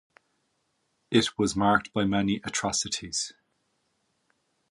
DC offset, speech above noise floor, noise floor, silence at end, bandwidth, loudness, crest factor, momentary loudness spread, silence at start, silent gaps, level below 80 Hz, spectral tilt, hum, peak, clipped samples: under 0.1%; 48 dB; -75 dBFS; 1.4 s; 11.5 kHz; -27 LUFS; 22 dB; 7 LU; 1.1 s; none; -56 dBFS; -3.5 dB/octave; none; -8 dBFS; under 0.1%